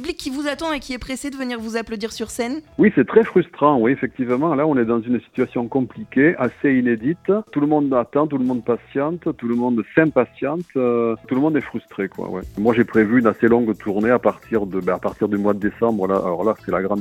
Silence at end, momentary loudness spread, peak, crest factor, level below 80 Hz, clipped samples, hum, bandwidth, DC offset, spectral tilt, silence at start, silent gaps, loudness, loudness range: 0 s; 10 LU; 0 dBFS; 18 dB; -50 dBFS; under 0.1%; none; 14.5 kHz; under 0.1%; -7 dB/octave; 0 s; none; -20 LUFS; 2 LU